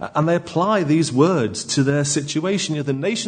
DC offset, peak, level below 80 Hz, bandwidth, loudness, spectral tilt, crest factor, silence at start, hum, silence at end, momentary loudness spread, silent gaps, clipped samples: under 0.1%; -4 dBFS; -60 dBFS; 9.6 kHz; -19 LUFS; -5 dB/octave; 16 dB; 0 s; none; 0 s; 5 LU; none; under 0.1%